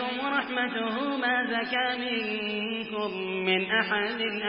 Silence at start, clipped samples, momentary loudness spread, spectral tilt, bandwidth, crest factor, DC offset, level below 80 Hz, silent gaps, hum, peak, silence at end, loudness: 0 s; under 0.1%; 6 LU; -8 dB/octave; 5.6 kHz; 18 dB; under 0.1%; -70 dBFS; none; none; -10 dBFS; 0 s; -28 LUFS